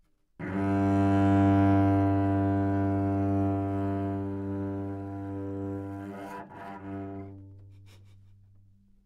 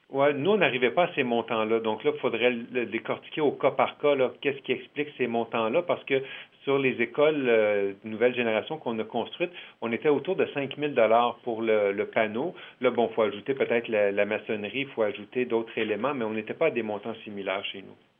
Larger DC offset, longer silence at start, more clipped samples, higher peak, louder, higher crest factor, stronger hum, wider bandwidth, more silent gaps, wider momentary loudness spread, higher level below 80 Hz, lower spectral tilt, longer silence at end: neither; first, 0.4 s vs 0.1 s; neither; second, -16 dBFS vs -8 dBFS; about the same, -28 LUFS vs -27 LUFS; about the same, 14 dB vs 18 dB; neither; first, 6.2 kHz vs 3.8 kHz; neither; first, 18 LU vs 9 LU; first, -58 dBFS vs -84 dBFS; about the same, -9.5 dB/octave vs -8.5 dB/octave; first, 1.15 s vs 0.3 s